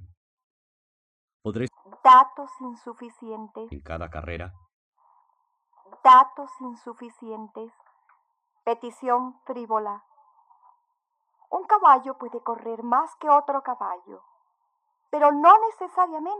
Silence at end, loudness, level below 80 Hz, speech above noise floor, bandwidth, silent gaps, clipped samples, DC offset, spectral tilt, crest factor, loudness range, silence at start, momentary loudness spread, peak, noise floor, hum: 0 s; -20 LUFS; -58 dBFS; 55 dB; 9 kHz; 0.17-0.37 s, 0.44-1.28 s, 1.34-1.40 s, 4.73-4.92 s; under 0.1%; under 0.1%; -6 dB/octave; 20 dB; 10 LU; 0 s; 24 LU; -4 dBFS; -77 dBFS; none